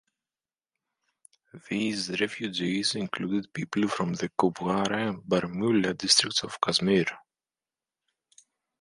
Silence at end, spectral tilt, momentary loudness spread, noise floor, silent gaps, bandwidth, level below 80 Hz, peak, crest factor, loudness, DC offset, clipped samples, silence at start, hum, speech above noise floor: 1.65 s; -3.5 dB/octave; 9 LU; under -90 dBFS; none; 11.5 kHz; -64 dBFS; -6 dBFS; 24 dB; -27 LUFS; under 0.1%; under 0.1%; 1.55 s; none; over 63 dB